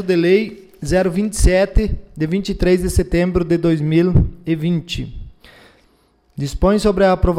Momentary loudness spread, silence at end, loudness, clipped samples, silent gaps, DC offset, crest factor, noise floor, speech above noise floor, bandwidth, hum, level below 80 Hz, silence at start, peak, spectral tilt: 12 LU; 0 s; -17 LUFS; under 0.1%; none; under 0.1%; 14 dB; -57 dBFS; 41 dB; 15 kHz; none; -24 dBFS; 0 s; -4 dBFS; -6.5 dB/octave